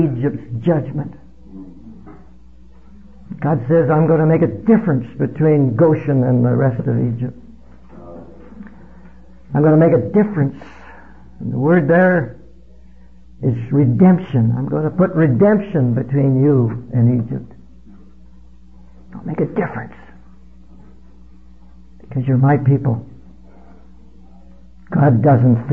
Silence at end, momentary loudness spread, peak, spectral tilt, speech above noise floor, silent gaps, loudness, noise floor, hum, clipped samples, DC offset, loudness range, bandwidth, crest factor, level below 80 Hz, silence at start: 0 s; 15 LU; 0 dBFS; -12 dB/octave; 30 dB; none; -16 LUFS; -45 dBFS; none; under 0.1%; 0.8%; 11 LU; 3.4 kHz; 16 dB; -46 dBFS; 0 s